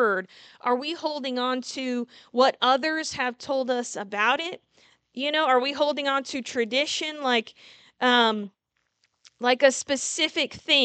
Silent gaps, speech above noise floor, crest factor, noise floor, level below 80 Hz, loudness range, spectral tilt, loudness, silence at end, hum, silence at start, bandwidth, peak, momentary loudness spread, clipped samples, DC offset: none; 48 dB; 20 dB; -73 dBFS; -72 dBFS; 2 LU; -1.5 dB/octave; -25 LUFS; 0 s; none; 0 s; 9.2 kHz; -4 dBFS; 10 LU; under 0.1%; under 0.1%